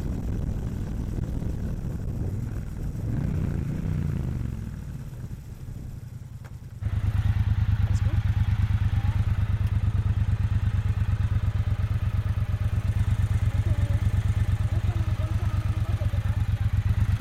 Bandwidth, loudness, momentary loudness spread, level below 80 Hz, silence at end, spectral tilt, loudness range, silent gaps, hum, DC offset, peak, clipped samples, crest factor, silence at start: 12.5 kHz; -27 LUFS; 12 LU; -32 dBFS; 0 s; -8 dB/octave; 6 LU; none; none; under 0.1%; -12 dBFS; under 0.1%; 12 dB; 0 s